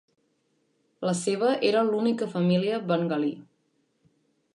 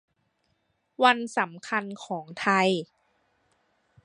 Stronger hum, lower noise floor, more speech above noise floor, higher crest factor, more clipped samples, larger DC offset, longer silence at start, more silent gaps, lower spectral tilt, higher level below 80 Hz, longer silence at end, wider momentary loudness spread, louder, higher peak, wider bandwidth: neither; about the same, -71 dBFS vs -74 dBFS; about the same, 46 dB vs 48 dB; second, 16 dB vs 24 dB; neither; neither; about the same, 1 s vs 1 s; neither; first, -6 dB/octave vs -4.5 dB/octave; about the same, -78 dBFS vs -78 dBFS; about the same, 1.15 s vs 1.2 s; second, 7 LU vs 14 LU; about the same, -26 LUFS vs -26 LUFS; second, -12 dBFS vs -4 dBFS; about the same, 11 kHz vs 11 kHz